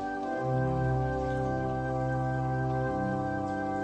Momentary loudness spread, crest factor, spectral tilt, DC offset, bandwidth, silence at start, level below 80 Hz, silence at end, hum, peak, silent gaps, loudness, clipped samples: 3 LU; 12 dB; -8.5 dB/octave; under 0.1%; 8.4 kHz; 0 s; -46 dBFS; 0 s; none; -18 dBFS; none; -31 LUFS; under 0.1%